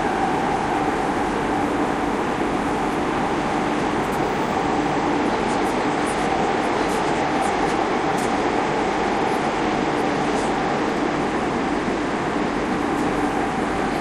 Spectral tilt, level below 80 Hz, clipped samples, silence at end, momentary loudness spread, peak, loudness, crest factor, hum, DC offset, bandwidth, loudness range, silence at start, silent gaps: -5 dB/octave; -42 dBFS; under 0.1%; 0 s; 2 LU; -8 dBFS; -22 LUFS; 14 dB; none; under 0.1%; 14.5 kHz; 1 LU; 0 s; none